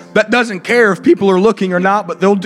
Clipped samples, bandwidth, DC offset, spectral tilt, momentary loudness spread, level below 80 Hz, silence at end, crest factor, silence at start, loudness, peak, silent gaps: under 0.1%; 12.5 kHz; under 0.1%; -6 dB/octave; 4 LU; -56 dBFS; 0 s; 12 dB; 0 s; -12 LUFS; 0 dBFS; none